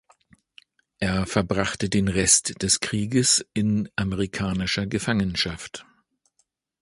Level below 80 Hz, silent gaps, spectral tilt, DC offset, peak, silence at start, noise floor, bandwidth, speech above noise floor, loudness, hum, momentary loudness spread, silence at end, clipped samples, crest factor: -44 dBFS; none; -3.5 dB/octave; under 0.1%; -4 dBFS; 1 s; -71 dBFS; 11.5 kHz; 48 dB; -23 LUFS; none; 9 LU; 1 s; under 0.1%; 22 dB